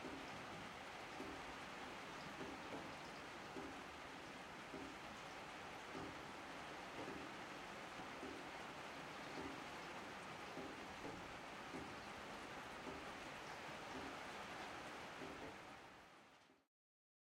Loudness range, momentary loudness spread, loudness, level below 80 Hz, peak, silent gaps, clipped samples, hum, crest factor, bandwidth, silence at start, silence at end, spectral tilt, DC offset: 1 LU; 3 LU; -52 LUFS; -74 dBFS; -38 dBFS; none; under 0.1%; none; 16 dB; 16 kHz; 0 s; 0.7 s; -3.5 dB/octave; under 0.1%